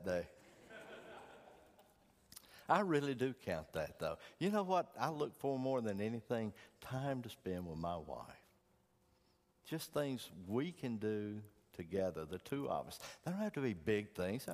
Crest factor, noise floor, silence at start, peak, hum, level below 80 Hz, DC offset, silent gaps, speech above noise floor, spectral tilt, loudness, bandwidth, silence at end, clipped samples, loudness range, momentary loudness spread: 24 dB; -75 dBFS; 0 s; -18 dBFS; none; -70 dBFS; under 0.1%; none; 35 dB; -6 dB/octave; -41 LUFS; 15.5 kHz; 0 s; under 0.1%; 7 LU; 18 LU